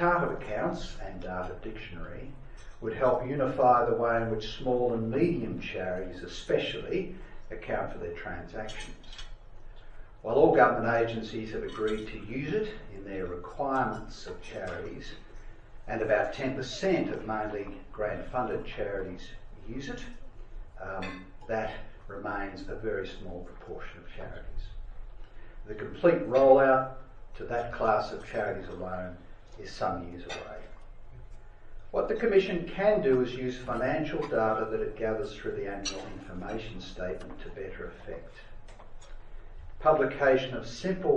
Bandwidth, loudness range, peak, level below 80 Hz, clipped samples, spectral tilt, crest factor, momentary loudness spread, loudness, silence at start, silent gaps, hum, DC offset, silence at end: 9 kHz; 12 LU; -8 dBFS; -48 dBFS; under 0.1%; -6 dB/octave; 24 dB; 20 LU; -30 LUFS; 0 s; none; none; under 0.1%; 0 s